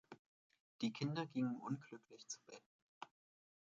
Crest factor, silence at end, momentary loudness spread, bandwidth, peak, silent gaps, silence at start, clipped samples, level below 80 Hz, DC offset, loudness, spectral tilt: 18 dB; 0.55 s; 20 LU; 7.8 kHz; -30 dBFS; 0.19-0.50 s, 0.60-0.79 s, 2.66-3.01 s; 0.1 s; under 0.1%; -90 dBFS; under 0.1%; -45 LUFS; -5.5 dB/octave